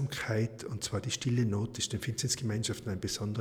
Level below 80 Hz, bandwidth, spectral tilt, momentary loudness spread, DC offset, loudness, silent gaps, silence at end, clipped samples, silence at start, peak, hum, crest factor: -58 dBFS; 19 kHz; -4.5 dB/octave; 5 LU; under 0.1%; -33 LUFS; none; 0 s; under 0.1%; 0 s; -18 dBFS; none; 16 dB